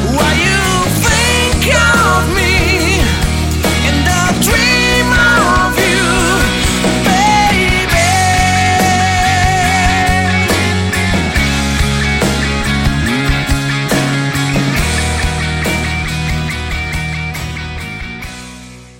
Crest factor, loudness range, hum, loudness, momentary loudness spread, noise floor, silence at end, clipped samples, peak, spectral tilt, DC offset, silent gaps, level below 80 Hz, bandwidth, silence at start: 12 dB; 5 LU; none; -12 LUFS; 9 LU; -33 dBFS; 0.1 s; under 0.1%; 0 dBFS; -4 dB/octave; under 0.1%; none; -22 dBFS; 16.5 kHz; 0 s